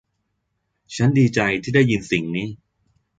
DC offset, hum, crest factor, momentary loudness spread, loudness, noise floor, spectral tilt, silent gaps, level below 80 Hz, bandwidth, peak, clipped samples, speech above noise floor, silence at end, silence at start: under 0.1%; none; 18 dB; 12 LU; -19 LUFS; -74 dBFS; -6.5 dB/octave; none; -52 dBFS; 9.2 kHz; -4 dBFS; under 0.1%; 55 dB; 0.65 s; 0.9 s